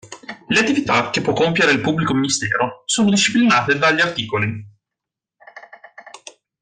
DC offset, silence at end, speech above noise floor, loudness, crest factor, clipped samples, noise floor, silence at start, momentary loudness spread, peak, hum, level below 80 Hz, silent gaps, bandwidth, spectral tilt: under 0.1%; 0.45 s; 67 dB; -17 LUFS; 16 dB; under 0.1%; -85 dBFS; 0.05 s; 8 LU; -4 dBFS; none; -56 dBFS; none; 9.8 kHz; -3.5 dB/octave